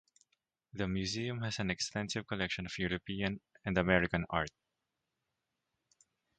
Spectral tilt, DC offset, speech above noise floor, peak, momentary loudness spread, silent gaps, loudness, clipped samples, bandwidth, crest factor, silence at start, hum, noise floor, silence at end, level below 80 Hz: -4.5 dB/octave; under 0.1%; 52 dB; -12 dBFS; 9 LU; none; -36 LUFS; under 0.1%; 9 kHz; 26 dB; 0.75 s; none; -87 dBFS; 1.9 s; -56 dBFS